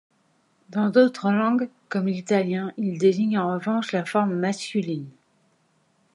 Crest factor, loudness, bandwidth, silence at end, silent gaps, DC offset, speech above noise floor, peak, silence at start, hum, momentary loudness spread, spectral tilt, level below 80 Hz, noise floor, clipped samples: 18 dB; -24 LUFS; 11.5 kHz; 1.05 s; none; under 0.1%; 43 dB; -6 dBFS; 0.7 s; none; 9 LU; -6.5 dB/octave; -74 dBFS; -66 dBFS; under 0.1%